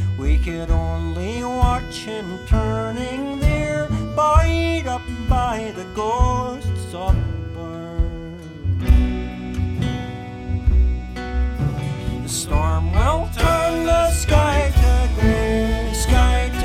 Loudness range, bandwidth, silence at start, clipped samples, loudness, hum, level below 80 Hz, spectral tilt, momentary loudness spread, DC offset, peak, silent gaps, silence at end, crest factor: 5 LU; 15 kHz; 0 s; under 0.1%; -21 LUFS; none; -22 dBFS; -6 dB/octave; 11 LU; under 0.1%; -2 dBFS; none; 0 s; 18 dB